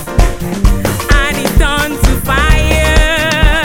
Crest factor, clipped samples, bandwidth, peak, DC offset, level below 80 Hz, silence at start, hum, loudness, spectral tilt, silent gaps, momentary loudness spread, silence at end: 10 dB; under 0.1%; 17 kHz; 0 dBFS; under 0.1%; -12 dBFS; 0 s; none; -12 LUFS; -4.5 dB/octave; none; 4 LU; 0 s